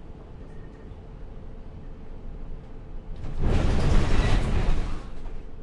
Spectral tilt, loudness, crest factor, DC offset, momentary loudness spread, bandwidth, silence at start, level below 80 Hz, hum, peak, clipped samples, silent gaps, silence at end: -6.5 dB/octave; -27 LUFS; 16 dB; under 0.1%; 20 LU; 10 kHz; 0 s; -28 dBFS; none; -8 dBFS; under 0.1%; none; 0 s